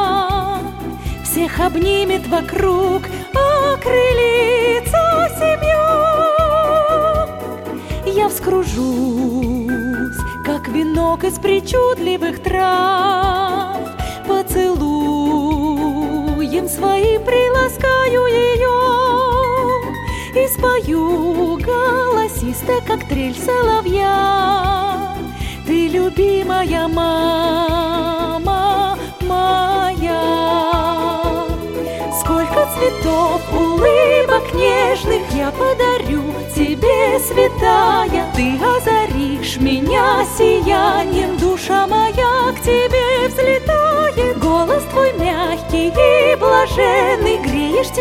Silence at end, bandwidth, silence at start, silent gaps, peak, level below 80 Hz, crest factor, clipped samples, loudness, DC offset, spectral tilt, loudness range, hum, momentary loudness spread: 0 s; 17 kHz; 0 s; none; 0 dBFS; -30 dBFS; 14 dB; under 0.1%; -15 LUFS; under 0.1%; -5 dB/octave; 3 LU; none; 7 LU